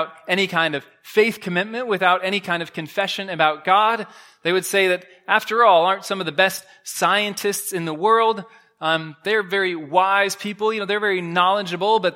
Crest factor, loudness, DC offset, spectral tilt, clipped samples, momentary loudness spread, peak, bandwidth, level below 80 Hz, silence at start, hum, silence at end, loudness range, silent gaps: 20 dB; -20 LUFS; under 0.1%; -3.5 dB/octave; under 0.1%; 8 LU; 0 dBFS; 16.5 kHz; -76 dBFS; 0 s; none; 0 s; 2 LU; none